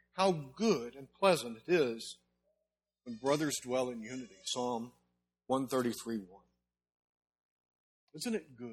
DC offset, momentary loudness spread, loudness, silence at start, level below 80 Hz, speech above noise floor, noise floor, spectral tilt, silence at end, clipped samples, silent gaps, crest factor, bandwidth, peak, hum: under 0.1%; 14 LU; -35 LUFS; 0.15 s; -76 dBFS; 53 dB; -88 dBFS; -4.5 dB/octave; 0 s; under 0.1%; 6.94-7.15 s, 7.43-8.07 s; 22 dB; 16 kHz; -14 dBFS; 60 Hz at -65 dBFS